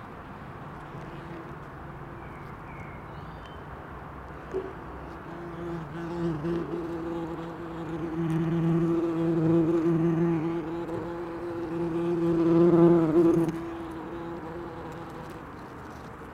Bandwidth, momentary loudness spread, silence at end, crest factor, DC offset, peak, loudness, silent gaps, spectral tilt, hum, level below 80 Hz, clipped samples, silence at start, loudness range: 7.2 kHz; 20 LU; 0 s; 20 dB; under 0.1%; -10 dBFS; -27 LUFS; none; -9 dB/octave; none; -52 dBFS; under 0.1%; 0 s; 17 LU